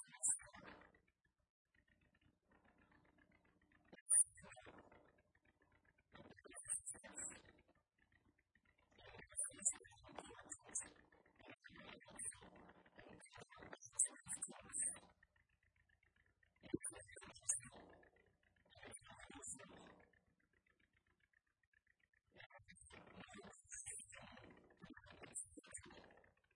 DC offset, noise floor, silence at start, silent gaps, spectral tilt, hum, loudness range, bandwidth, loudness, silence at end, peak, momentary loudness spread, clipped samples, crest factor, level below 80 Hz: under 0.1%; -84 dBFS; 0 s; 1.50-1.65 s, 4.01-4.06 s, 21.67-21.72 s, 22.46-22.50 s; -1.5 dB/octave; none; 17 LU; 12 kHz; -44 LUFS; 0.35 s; -20 dBFS; 24 LU; under 0.1%; 32 dB; -80 dBFS